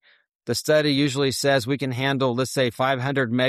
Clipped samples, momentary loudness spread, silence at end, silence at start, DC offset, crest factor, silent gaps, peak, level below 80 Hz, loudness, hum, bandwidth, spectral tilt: under 0.1%; 6 LU; 0 s; 0.45 s; under 0.1%; 14 dB; none; -8 dBFS; -60 dBFS; -22 LUFS; none; 15 kHz; -5 dB/octave